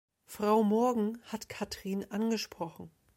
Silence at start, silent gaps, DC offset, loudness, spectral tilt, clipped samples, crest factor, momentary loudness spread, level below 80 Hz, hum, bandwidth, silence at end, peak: 0.3 s; none; under 0.1%; -32 LUFS; -5.5 dB/octave; under 0.1%; 18 dB; 15 LU; -68 dBFS; none; 16.5 kHz; 0.3 s; -16 dBFS